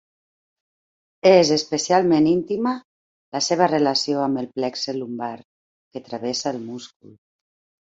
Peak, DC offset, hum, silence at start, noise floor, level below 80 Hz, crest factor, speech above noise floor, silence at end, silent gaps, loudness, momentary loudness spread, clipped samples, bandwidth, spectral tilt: -2 dBFS; under 0.1%; none; 1.25 s; under -90 dBFS; -64 dBFS; 20 dB; over 69 dB; 0.95 s; 2.85-3.32 s, 5.44-5.91 s; -20 LUFS; 17 LU; under 0.1%; 8 kHz; -4.5 dB/octave